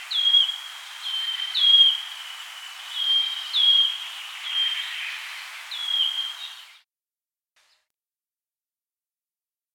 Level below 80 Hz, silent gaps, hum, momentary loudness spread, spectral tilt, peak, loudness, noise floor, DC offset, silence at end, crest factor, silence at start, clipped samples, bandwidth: under -90 dBFS; none; none; 20 LU; 10.5 dB/octave; -6 dBFS; -20 LUFS; under -90 dBFS; under 0.1%; 3 s; 20 dB; 0 s; under 0.1%; 17 kHz